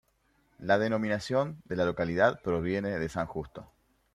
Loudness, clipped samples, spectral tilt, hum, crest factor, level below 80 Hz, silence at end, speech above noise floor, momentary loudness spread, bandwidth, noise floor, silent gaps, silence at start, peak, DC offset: -30 LUFS; under 0.1%; -6.5 dB/octave; none; 20 dB; -58 dBFS; 0.5 s; 41 dB; 13 LU; 13 kHz; -70 dBFS; none; 0.6 s; -10 dBFS; under 0.1%